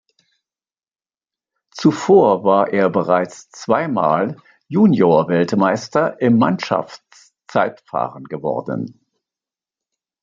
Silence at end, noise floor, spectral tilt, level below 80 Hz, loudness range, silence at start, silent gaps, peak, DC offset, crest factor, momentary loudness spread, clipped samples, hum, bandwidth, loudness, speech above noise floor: 1.3 s; under -90 dBFS; -7 dB/octave; -62 dBFS; 7 LU; 1.75 s; none; -2 dBFS; under 0.1%; 18 dB; 13 LU; under 0.1%; none; 7.6 kHz; -17 LUFS; over 74 dB